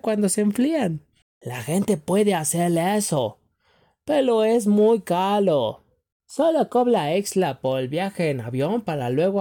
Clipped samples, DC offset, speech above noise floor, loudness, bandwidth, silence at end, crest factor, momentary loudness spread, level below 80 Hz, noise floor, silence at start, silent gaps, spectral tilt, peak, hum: under 0.1%; under 0.1%; 42 dB; -22 LUFS; 18.5 kHz; 0 s; 12 dB; 8 LU; -64 dBFS; -63 dBFS; 0.05 s; 1.22-1.41 s, 6.12-6.20 s; -5.5 dB/octave; -10 dBFS; none